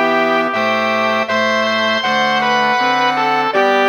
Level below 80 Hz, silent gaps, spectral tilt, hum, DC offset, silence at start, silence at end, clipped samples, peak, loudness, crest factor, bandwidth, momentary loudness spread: -72 dBFS; none; -3.5 dB/octave; none; under 0.1%; 0 s; 0 s; under 0.1%; -2 dBFS; -14 LUFS; 12 dB; 19.5 kHz; 2 LU